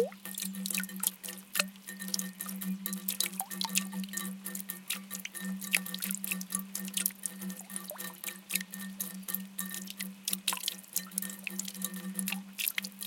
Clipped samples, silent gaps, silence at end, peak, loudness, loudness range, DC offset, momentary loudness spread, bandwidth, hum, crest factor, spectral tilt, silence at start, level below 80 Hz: under 0.1%; none; 0 s; -6 dBFS; -35 LUFS; 2 LU; under 0.1%; 8 LU; 17 kHz; none; 32 dB; -2 dB/octave; 0 s; -84 dBFS